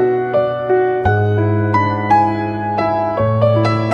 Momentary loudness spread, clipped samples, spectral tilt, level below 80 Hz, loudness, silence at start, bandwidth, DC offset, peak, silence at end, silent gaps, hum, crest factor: 4 LU; under 0.1%; -8.5 dB/octave; -40 dBFS; -15 LUFS; 0 s; 6.6 kHz; under 0.1%; -2 dBFS; 0 s; none; none; 14 dB